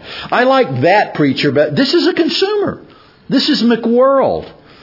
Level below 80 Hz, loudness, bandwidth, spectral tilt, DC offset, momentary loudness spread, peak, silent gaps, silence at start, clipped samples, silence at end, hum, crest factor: -54 dBFS; -13 LUFS; 5.8 kHz; -6 dB/octave; under 0.1%; 6 LU; 0 dBFS; none; 0 s; under 0.1%; 0.3 s; none; 12 dB